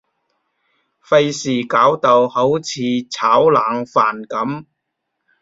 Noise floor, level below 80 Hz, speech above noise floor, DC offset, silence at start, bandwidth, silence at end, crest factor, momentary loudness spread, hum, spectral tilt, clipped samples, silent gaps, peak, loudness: -75 dBFS; -62 dBFS; 60 dB; under 0.1%; 1.1 s; 7.8 kHz; 0.8 s; 16 dB; 10 LU; none; -5 dB/octave; under 0.1%; none; -2 dBFS; -16 LUFS